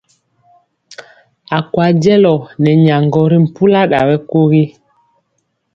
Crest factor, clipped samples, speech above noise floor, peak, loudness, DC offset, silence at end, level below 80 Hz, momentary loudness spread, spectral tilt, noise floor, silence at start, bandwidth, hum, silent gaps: 12 dB; under 0.1%; 56 dB; 0 dBFS; -12 LUFS; under 0.1%; 1.05 s; -52 dBFS; 6 LU; -8.5 dB/octave; -66 dBFS; 1 s; 7.2 kHz; none; none